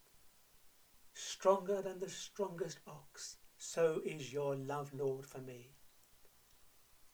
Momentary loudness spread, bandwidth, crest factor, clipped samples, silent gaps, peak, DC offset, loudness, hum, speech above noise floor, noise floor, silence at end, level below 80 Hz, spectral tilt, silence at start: 17 LU; over 20 kHz; 24 dB; under 0.1%; none; -18 dBFS; under 0.1%; -40 LUFS; none; 26 dB; -65 dBFS; 0.05 s; -76 dBFS; -4.5 dB/octave; 0.15 s